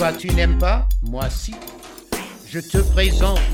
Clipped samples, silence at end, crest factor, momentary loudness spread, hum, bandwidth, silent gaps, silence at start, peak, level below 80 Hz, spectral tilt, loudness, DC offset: under 0.1%; 0 s; 16 dB; 14 LU; none; 16.5 kHz; none; 0 s; -4 dBFS; -20 dBFS; -5 dB/octave; -21 LUFS; under 0.1%